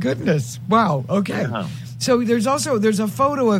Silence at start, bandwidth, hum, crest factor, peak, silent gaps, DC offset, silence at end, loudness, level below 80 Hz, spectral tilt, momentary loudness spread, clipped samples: 0 s; 16.5 kHz; none; 16 dB; -4 dBFS; none; under 0.1%; 0 s; -20 LUFS; -54 dBFS; -5.5 dB/octave; 7 LU; under 0.1%